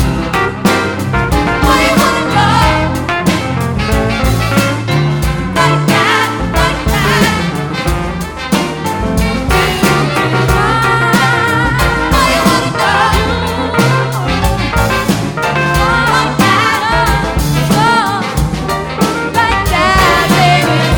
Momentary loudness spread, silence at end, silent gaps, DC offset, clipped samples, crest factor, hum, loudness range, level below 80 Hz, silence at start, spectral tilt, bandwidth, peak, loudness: 6 LU; 0 s; none; under 0.1%; under 0.1%; 10 dB; none; 2 LU; -22 dBFS; 0 s; -5 dB/octave; over 20 kHz; 0 dBFS; -12 LUFS